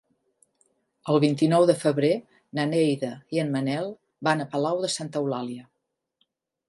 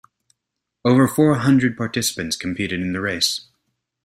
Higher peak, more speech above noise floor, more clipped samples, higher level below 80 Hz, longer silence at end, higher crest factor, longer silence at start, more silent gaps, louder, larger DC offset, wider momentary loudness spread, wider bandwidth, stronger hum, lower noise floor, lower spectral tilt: second, -6 dBFS vs -2 dBFS; second, 56 dB vs 62 dB; neither; second, -74 dBFS vs -56 dBFS; first, 1.05 s vs 0.65 s; about the same, 20 dB vs 18 dB; first, 1.05 s vs 0.85 s; neither; second, -25 LUFS vs -19 LUFS; neither; first, 12 LU vs 9 LU; second, 11.5 kHz vs 15.5 kHz; neither; about the same, -80 dBFS vs -81 dBFS; first, -6 dB/octave vs -4.5 dB/octave